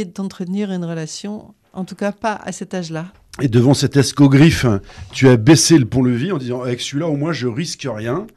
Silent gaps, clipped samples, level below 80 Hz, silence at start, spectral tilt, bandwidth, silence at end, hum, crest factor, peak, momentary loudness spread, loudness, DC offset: none; under 0.1%; -44 dBFS; 0 s; -5.5 dB/octave; 13.5 kHz; 0.1 s; none; 14 dB; -2 dBFS; 18 LU; -16 LUFS; under 0.1%